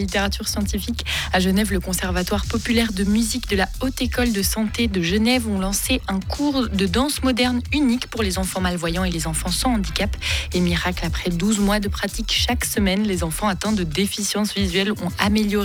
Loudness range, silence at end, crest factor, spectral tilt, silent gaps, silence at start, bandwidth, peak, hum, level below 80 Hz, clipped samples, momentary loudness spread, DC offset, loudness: 1 LU; 0 s; 14 dB; -4 dB/octave; none; 0 s; 19.5 kHz; -6 dBFS; none; -30 dBFS; under 0.1%; 4 LU; under 0.1%; -21 LUFS